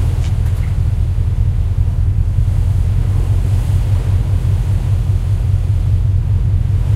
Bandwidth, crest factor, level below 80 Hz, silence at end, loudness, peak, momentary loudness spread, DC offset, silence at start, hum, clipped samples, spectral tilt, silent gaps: 11.5 kHz; 10 dB; -18 dBFS; 0 s; -16 LUFS; -2 dBFS; 1 LU; under 0.1%; 0 s; none; under 0.1%; -8 dB/octave; none